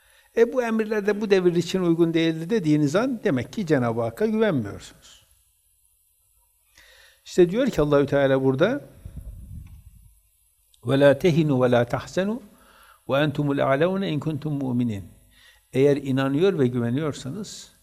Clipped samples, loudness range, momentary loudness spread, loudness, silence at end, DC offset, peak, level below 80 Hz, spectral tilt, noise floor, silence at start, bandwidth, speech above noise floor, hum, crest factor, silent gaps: under 0.1%; 5 LU; 15 LU; -22 LUFS; 0.15 s; under 0.1%; -4 dBFS; -52 dBFS; -7 dB/octave; -64 dBFS; 0.35 s; 14.5 kHz; 42 dB; none; 20 dB; none